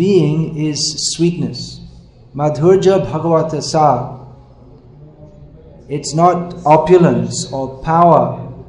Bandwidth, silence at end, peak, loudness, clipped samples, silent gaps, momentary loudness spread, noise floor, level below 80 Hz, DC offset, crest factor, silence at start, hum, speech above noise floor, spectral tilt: 10.5 kHz; 0.05 s; 0 dBFS; -14 LUFS; 0.2%; none; 14 LU; -41 dBFS; -42 dBFS; under 0.1%; 14 dB; 0 s; none; 28 dB; -5.5 dB/octave